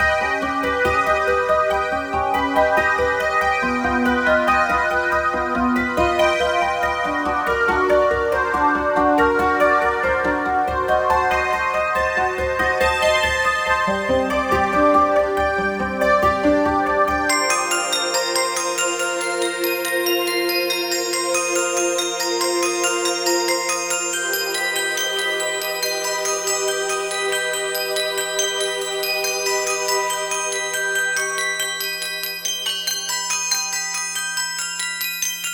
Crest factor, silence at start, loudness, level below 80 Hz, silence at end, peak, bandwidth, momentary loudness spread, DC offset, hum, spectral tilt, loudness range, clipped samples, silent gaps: 16 dB; 0 s; -19 LUFS; -42 dBFS; 0 s; -4 dBFS; over 20 kHz; 5 LU; under 0.1%; none; -2 dB/octave; 3 LU; under 0.1%; none